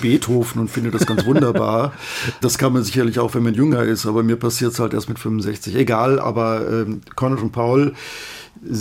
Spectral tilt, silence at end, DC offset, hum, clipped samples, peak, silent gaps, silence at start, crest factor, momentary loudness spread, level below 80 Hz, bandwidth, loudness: -6 dB/octave; 0 s; under 0.1%; none; under 0.1%; -2 dBFS; none; 0 s; 16 dB; 8 LU; -52 dBFS; 17 kHz; -19 LUFS